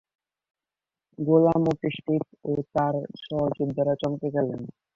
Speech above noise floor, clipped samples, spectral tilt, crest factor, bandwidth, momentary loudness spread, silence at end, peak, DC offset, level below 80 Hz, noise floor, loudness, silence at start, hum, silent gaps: over 65 dB; under 0.1%; -9 dB/octave; 18 dB; 7.2 kHz; 11 LU; 0.25 s; -8 dBFS; under 0.1%; -60 dBFS; under -90 dBFS; -26 LUFS; 1.2 s; none; none